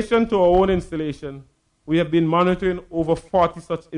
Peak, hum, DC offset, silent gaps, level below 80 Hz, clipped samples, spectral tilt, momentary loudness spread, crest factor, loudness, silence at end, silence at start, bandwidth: -6 dBFS; none; under 0.1%; none; -42 dBFS; under 0.1%; -7.5 dB/octave; 12 LU; 14 dB; -20 LUFS; 0 s; 0 s; 10.5 kHz